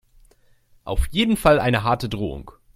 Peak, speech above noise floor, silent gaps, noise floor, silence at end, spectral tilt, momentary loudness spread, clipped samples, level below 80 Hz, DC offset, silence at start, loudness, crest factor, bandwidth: -2 dBFS; 36 dB; none; -56 dBFS; 0.25 s; -5.5 dB/octave; 15 LU; under 0.1%; -32 dBFS; under 0.1%; 0.85 s; -21 LUFS; 20 dB; 16 kHz